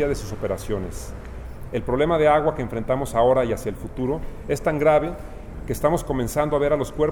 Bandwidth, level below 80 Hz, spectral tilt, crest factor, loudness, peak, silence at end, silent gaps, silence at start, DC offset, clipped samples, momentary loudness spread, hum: 19.5 kHz; -36 dBFS; -6.5 dB/octave; 16 dB; -23 LUFS; -6 dBFS; 0 s; none; 0 s; under 0.1%; under 0.1%; 17 LU; none